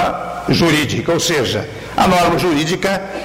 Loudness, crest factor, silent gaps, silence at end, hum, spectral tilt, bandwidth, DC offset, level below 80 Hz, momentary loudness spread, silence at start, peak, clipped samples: -16 LUFS; 12 dB; none; 0 s; none; -4.5 dB/octave; 16 kHz; under 0.1%; -40 dBFS; 7 LU; 0 s; -4 dBFS; under 0.1%